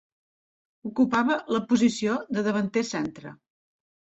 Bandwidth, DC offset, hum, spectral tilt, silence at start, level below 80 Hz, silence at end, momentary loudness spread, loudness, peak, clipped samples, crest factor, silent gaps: 8.2 kHz; under 0.1%; none; -5 dB/octave; 0.85 s; -66 dBFS; 0.8 s; 14 LU; -25 LUFS; -10 dBFS; under 0.1%; 16 dB; none